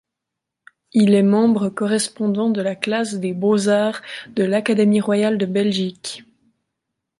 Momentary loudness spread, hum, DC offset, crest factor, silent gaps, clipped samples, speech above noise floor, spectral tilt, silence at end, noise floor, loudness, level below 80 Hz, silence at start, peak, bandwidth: 10 LU; none; under 0.1%; 18 dB; none; under 0.1%; 64 dB; -5.5 dB/octave; 1 s; -82 dBFS; -19 LUFS; -66 dBFS; 0.95 s; -2 dBFS; 11.5 kHz